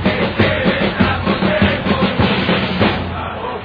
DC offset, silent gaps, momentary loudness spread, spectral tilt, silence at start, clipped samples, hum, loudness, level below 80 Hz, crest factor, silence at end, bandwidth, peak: under 0.1%; none; 6 LU; -8.5 dB/octave; 0 s; under 0.1%; none; -16 LUFS; -34 dBFS; 14 dB; 0 s; 5.2 kHz; 0 dBFS